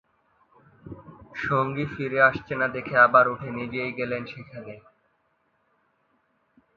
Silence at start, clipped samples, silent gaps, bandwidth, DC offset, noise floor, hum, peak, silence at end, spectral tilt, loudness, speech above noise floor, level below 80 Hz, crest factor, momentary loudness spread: 0.85 s; under 0.1%; none; 7 kHz; under 0.1%; -70 dBFS; none; -4 dBFS; 1.95 s; -8 dB/octave; -23 LUFS; 46 dB; -60 dBFS; 24 dB; 26 LU